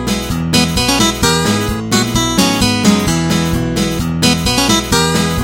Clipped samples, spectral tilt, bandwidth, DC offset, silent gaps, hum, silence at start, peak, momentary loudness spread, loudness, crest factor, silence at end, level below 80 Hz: under 0.1%; -4 dB/octave; 17 kHz; under 0.1%; none; none; 0 s; 0 dBFS; 5 LU; -13 LUFS; 14 dB; 0 s; -28 dBFS